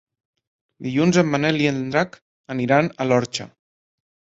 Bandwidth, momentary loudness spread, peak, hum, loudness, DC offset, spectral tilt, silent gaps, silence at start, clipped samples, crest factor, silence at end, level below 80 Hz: 8 kHz; 13 LU; -2 dBFS; none; -21 LUFS; under 0.1%; -5.5 dB/octave; 2.22-2.44 s; 0.8 s; under 0.1%; 20 dB; 0.9 s; -60 dBFS